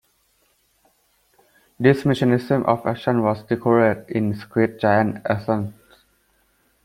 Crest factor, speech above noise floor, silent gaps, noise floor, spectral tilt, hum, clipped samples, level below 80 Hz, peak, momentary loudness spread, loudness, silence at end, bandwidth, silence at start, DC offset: 20 dB; 44 dB; none; -64 dBFS; -8 dB/octave; none; under 0.1%; -56 dBFS; -2 dBFS; 7 LU; -20 LUFS; 1.1 s; 15.5 kHz; 1.8 s; under 0.1%